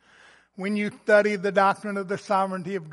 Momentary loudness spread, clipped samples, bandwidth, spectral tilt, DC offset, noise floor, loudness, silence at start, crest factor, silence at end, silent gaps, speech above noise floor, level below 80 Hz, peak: 10 LU; under 0.1%; 11.5 kHz; -6 dB/octave; under 0.1%; -55 dBFS; -24 LUFS; 0.6 s; 20 dB; 0 s; none; 31 dB; -76 dBFS; -6 dBFS